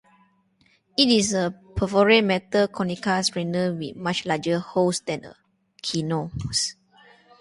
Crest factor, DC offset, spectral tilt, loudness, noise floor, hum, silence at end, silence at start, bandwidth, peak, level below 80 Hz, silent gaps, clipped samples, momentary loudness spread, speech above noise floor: 22 dB; under 0.1%; -4 dB/octave; -23 LUFS; -63 dBFS; none; 0.7 s; 1 s; 11.5 kHz; -4 dBFS; -50 dBFS; none; under 0.1%; 11 LU; 40 dB